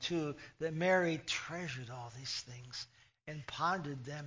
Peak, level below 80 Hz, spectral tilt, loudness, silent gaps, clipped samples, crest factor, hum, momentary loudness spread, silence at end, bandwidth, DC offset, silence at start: -20 dBFS; -70 dBFS; -4.5 dB/octave; -38 LUFS; none; under 0.1%; 18 dB; none; 16 LU; 0 s; 7.6 kHz; under 0.1%; 0 s